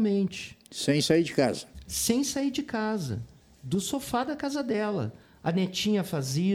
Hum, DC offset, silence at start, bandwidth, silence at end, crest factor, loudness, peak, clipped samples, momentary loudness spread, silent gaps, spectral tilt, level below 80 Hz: none; under 0.1%; 0 s; 19 kHz; 0 s; 20 dB; -29 LUFS; -8 dBFS; under 0.1%; 13 LU; none; -4.5 dB/octave; -56 dBFS